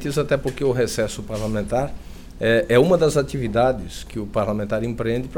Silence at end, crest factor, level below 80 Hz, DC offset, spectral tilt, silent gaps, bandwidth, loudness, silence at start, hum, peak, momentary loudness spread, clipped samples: 0 s; 16 dB; -38 dBFS; under 0.1%; -6 dB/octave; none; 17.5 kHz; -21 LUFS; 0 s; none; -4 dBFS; 11 LU; under 0.1%